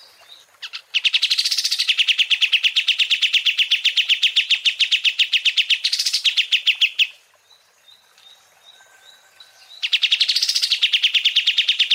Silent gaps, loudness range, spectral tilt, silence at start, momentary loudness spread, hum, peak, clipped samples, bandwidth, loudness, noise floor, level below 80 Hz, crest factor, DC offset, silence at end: none; 7 LU; 7.5 dB/octave; 0.3 s; 4 LU; none; -6 dBFS; under 0.1%; 16 kHz; -16 LUFS; -55 dBFS; under -90 dBFS; 16 dB; under 0.1%; 0 s